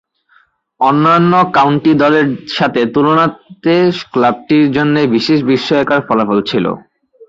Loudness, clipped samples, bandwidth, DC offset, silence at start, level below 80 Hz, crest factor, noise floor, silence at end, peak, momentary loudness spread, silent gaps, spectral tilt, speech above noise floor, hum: -12 LUFS; under 0.1%; 7.6 kHz; under 0.1%; 0.8 s; -52 dBFS; 12 dB; -53 dBFS; 0.05 s; 0 dBFS; 7 LU; none; -7 dB/octave; 41 dB; none